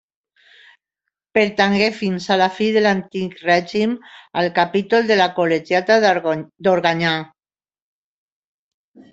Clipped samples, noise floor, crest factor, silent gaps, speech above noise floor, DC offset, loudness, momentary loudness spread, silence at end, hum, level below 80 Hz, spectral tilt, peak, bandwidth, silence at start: under 0.1%; under -90 dBFS; 18 dB; none; over 72 dB; under 0.1%; -18 LUFS; 9 LU; 1.9 s; none; -60 dBFS; -5.5 dB/octave; 0 dBFS; 8 kHz; 1.35 s